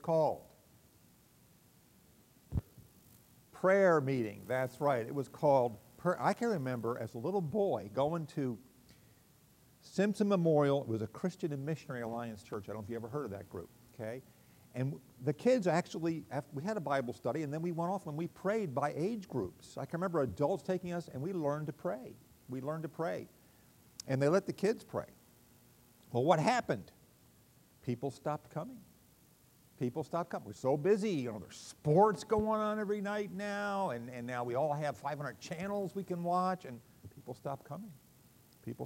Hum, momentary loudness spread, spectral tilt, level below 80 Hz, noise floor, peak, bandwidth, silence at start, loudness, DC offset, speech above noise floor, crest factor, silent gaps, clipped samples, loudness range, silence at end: none; 15 LU; -7 dB/octave; -64 dBFS; -65 dBFS; -14 dBFS; 16 kHz; 0.05 s; -36 LUFS; under 0.1%; 30 dB; 22 dB; none; under 0.1%; 8 LU; 0 s